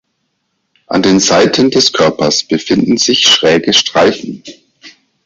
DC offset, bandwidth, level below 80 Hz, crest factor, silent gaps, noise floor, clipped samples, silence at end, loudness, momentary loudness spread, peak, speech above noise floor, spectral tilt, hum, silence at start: under 0.1%; 8 kHz; -48 dBFS; 12 dB; none; -66 dBFS; under 0.1%; 0.35 s; -9 LUFS; 8 LU; 0 dBFS; 56 dB; -3 dB/octave; none; 0.9 s